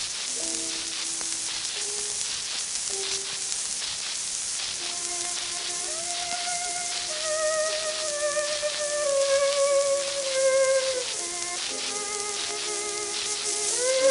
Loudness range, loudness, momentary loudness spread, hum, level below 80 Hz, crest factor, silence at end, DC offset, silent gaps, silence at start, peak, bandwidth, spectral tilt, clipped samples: 3 LU; -26 LUFS; 6 LU; none; -64 dBFS; 22 dB; 0 s; under 0.1%; none; 0 s; -6 dBFS; 11.5 kHz; 1 dB/octave; under 0.1%